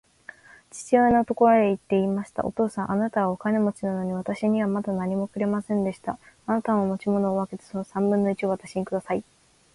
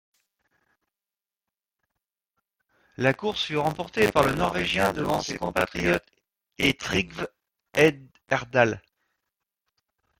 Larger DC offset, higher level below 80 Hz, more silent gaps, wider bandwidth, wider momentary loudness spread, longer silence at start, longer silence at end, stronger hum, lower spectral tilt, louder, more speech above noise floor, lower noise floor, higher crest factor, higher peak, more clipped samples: neither; second, -58 dBFS vs -52 dBFS; neither; second, 11.5 kHz vs 16.5 kHz; first, 12 LU vs 8 LU; second, 0.75 s vs 3 s; second, 0.55 s vs 1.4 s; neither; first, -7.5 dB/octave vs -4.5 dB/octave; about the same, -25 LUFS vs -25 LUFS; second, 24 dB vs over 65 dB; second, -48 dBFS vs under -90 dBFS; second, 18 dB vs 24 dB; about the same, -6 dBFS vs -4 dBFS; neither